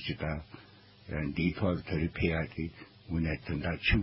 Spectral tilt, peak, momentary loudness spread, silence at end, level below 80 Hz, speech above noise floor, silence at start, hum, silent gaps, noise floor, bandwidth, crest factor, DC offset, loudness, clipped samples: -10 dB/octave; -14 dBFS; 16 LU; 0 s; -42 dBFS; 24 dB; 0 s; none; none; -56 dBFS; 5.8 kHz; 18 dB; under 0.1%; -34 LUFS; under 0.1%